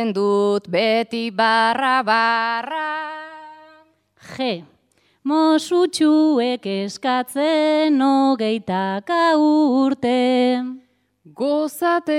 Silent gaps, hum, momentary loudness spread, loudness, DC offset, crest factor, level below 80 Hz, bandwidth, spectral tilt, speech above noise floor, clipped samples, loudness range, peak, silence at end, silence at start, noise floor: none; 50 Hz at -65 dBFS; 10 LU; -19 LUFS; under 0.1%; 14 dB; -70 dBFS; 14.5 kHz; -4.5 dB/octave; 44 dB; under 0.1%; 5 LU; -6 dBFS; 0 s; 0 s; -62 dBFS